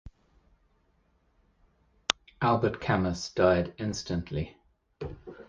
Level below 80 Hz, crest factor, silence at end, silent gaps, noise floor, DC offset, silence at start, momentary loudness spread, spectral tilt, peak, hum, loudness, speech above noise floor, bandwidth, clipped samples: -50 dBFS; 30 dB; 0.05 s; none; -69 dBFS; under 0.1%; 0.05 s; 17 LU; -5 dB/octave; 0 dBFS; none; -29 LUFS; 41 dB; 9.8 kHz; under 0.1%